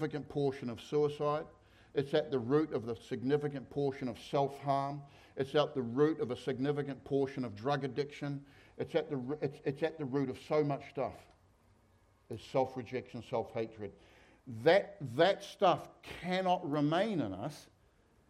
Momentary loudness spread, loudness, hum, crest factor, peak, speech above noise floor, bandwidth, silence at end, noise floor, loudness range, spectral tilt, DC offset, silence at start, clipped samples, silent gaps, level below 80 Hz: 12 LU; -35 LUFS; none; 20 dB; -14 dBFS; 33 dB; 13 kHz; 0.65 s; -68 dBFS; 6 LU; -7 dB/octave; under 0.1%; 0 s; under 0.1%; none; -70 dBFS